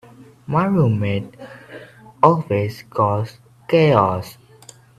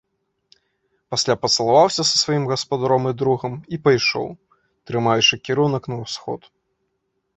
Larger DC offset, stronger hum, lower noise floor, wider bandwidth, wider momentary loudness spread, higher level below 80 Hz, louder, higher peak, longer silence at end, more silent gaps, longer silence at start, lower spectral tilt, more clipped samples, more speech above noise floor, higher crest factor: neither; neither; second, -46 dBFS vs -73 dBFS; first, 13.5 kHz vs 8.4 kHz; first, 23 LU vs 13 LU; about the same, -56 dBFS vs -58 dBFS; about the same, -18 LUFS vs -19 LUFS; about the same, 0 dBFS vs -2 dBFS; second, 0.65 s vs 1 s; neither; second, 0.2 s vs 1.1 s; first, -8 dB/octave vs -4 dB/octave; neither; second, 28 dB vs 53 dB; about the same, 20 dB vs 20 dB